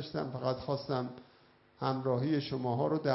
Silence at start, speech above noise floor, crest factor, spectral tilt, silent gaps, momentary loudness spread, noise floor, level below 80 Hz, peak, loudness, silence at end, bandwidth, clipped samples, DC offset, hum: 0 s; 31 dB; 18 dB; -6 dB/octave; none; 6 LU; -64 dBFS; -66 dBFS; -16 dBFS; -34 LUFS; 0 s; 5.8 kHz; under 0.1%; under 0.1%; none